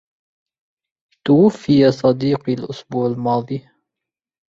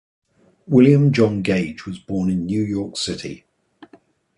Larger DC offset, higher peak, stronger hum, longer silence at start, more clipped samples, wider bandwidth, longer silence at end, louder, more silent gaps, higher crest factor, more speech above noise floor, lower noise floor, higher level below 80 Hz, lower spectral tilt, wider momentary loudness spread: neither; about the same, -2 dBFS vs -2 dBFS; neither; first, 1.25 s vs 0.7 s; neither; second, 7.6 kHz vs 11 kHz; about the same, 0.9 s vs 1 s; about the same, -17 LUFS vs -19 LUFS; neither; about the same, 16 dB vs 18 dB; first, 69 dB vs 35 dB; first, -85 dBFS vs -53 dBFS; second, -58 dBFS vs -50 dBFS; about the same, -8 dB/octave vs -7 dB/octave; second, 13 LU vs 17 LU